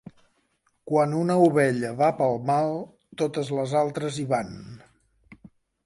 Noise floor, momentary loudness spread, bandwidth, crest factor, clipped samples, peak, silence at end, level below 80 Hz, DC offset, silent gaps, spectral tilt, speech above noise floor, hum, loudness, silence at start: -70 dBFS; 15 LU; 11.5 kHz; 20 dB; under 0.1%; -6 dBFS; 0.5 s; -64 dBFS; under 0.1%; none; -6.5 dB/octave; 46 dB; none; -24 LUFS; 0.85 s